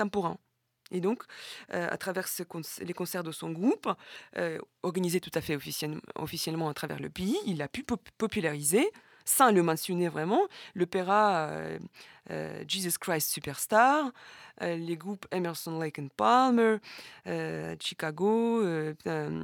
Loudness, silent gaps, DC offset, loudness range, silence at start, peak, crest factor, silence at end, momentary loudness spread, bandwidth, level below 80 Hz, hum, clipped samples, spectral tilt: -30 LUFS; none; under 0.1%; 6 LU; 0 s; -8 dBFS; 22 dB; 0 s; 14 LU; 19.5 kHz; -66 dBFS; none; under 0.1%; -4 dB/octave